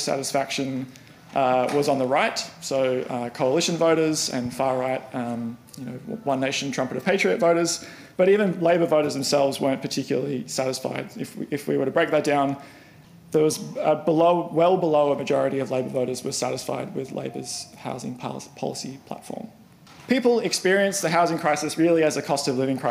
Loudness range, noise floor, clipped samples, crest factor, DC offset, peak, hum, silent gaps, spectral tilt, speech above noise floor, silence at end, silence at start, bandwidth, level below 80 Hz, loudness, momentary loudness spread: 6 LU; -49 dBFS; under 0.1%; 18 dB; under 0.1%; -6 dBFS; none; none; -4.5 dB/octave; 25 dB; 0 s; 0 s; 15.5 kHz; -66 dBFS; -23 LUFS; 13 LU